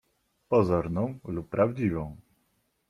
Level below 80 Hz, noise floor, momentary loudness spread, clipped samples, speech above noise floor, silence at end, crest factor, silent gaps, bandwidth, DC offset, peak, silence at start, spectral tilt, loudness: -54 dBFS; -73 dBFS; 11 LU; under 0.1%; 46 dB; 0.7 s; 18 dB; none; 13 kHz; under 0.1%; -10 dBFS; 0.5 s; -9.5 dB/octave; -28 LUFS